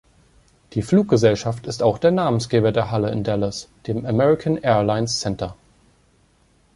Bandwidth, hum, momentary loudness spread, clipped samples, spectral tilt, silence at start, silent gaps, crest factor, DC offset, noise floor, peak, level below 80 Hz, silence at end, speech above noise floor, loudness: 11.5 kHz; none; 11 LU; under 0.1%; -6 dB/octave; 0.75 s; none; 18 dB; under 0.1%; -59 dBFS; -2 dBFS; -48 dBFS; 1.2 s; 39 dB; -20 LUFS